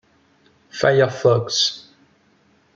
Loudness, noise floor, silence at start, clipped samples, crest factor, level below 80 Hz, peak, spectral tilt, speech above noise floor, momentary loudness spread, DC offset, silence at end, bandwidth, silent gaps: -18 LUFS; -58 dBFS; 0.75 s; under 0.1%; 18 dB; -62 dBFS; -4 dBFS; -4 dB/octave; 41 dB; 15 LU; under 0.1%; 0.95 s; 7.8 kHz; none